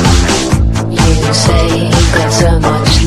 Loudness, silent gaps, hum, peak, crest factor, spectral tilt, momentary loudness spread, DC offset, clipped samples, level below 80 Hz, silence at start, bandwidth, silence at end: -10 LUFS; none; none; 0 dBFS; 8 dB; -4.5 dB/octave; 2 LU; under 0.1%; 0.4%; -14 dBFS; 0 s; 13.5 kHz; 0 s